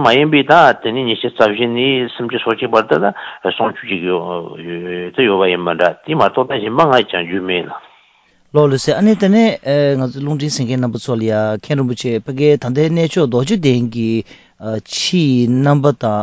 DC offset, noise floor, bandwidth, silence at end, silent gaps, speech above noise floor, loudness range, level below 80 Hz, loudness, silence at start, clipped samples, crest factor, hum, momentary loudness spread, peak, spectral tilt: under 0.1%; -53 dBFS; 8 kHz; 0 s; none; 39 dB; 2 LU; -54 dBFS; -15 LUFS; 0 s; under 0.1%; 14 dB; none; 9 LU; 0 dBFS; -6 dB/octave